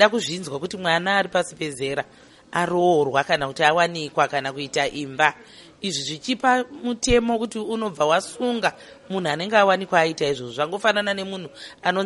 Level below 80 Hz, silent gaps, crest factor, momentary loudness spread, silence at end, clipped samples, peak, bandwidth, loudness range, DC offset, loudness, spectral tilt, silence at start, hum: -46 dBFS; none; 22 dB; 10 LU; 0 s; under 0.1%; 0 dBFS; 11.5 kHz; 2 LU; under 0.1%; -22 LUFS; -4 dB/octave; 0 s; none